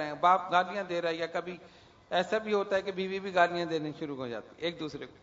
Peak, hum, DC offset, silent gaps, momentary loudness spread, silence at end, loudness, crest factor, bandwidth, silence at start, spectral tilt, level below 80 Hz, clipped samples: -10 dBFS; none; under 0.1%; none; 13 LU; 0.1 s; -31 LUFS; 22 dB; 7.8 kHz; 0 s; -5 dB/octave; -70 dBFS; under 0.1%